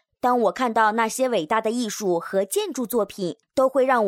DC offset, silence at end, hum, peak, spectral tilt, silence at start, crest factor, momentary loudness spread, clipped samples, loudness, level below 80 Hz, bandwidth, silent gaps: under 0.1%; 0 s; none; -6 dBFS; -4 dB/octave; 0.25 s; 16 dB; 6 LU; under 0.1%; -23 LUFS; -66 dBFS; 17.5 kHz; none